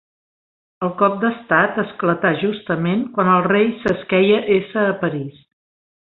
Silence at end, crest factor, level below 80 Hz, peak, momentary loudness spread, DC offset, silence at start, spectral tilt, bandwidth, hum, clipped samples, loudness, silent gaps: 0.8 s; 18 dB; -58 dBFS; -2 dBFS; 8 LU; under 0.1%; 0.8 s; -8.5 dB/octave; 4.8 kHz; none; under 0.1%; -18 LUFS; none